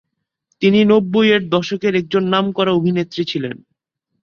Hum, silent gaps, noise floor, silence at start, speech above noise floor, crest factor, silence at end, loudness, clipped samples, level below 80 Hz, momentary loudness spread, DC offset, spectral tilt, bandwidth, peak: none; none; -73 dBFS; 0.6 s; 58 dB; 16 dB; 0.65 s; -16 LUFS; under 0.1%; -58 dBFS; 9 LU; under 0.1%; -6.5 dB/octave; 6.8 kHz; -2 dBFS